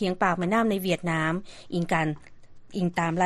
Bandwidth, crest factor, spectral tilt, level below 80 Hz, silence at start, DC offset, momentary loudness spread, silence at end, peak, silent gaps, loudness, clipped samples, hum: 13 kHz; 18 dB; -6 dB/octave; -54 dBFS; 0 s; under 0.1%; 10 LU; 0 s; -8 dBFS; none; -27 LUFS; under 0.1%; none